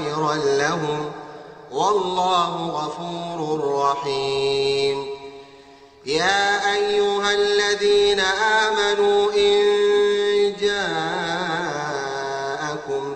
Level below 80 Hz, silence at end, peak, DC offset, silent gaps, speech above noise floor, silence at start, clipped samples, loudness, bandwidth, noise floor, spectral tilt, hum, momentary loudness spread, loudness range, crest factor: -54 dBFS; 0 s; -4 dBFS; under 0.1%; none; 27 dB; 0 s; under 0.1%; -20 LUFS; 8.8 kHz; -47 dBFS; -3 dB/octave; none; 11 LU; 6 LU; 16 dB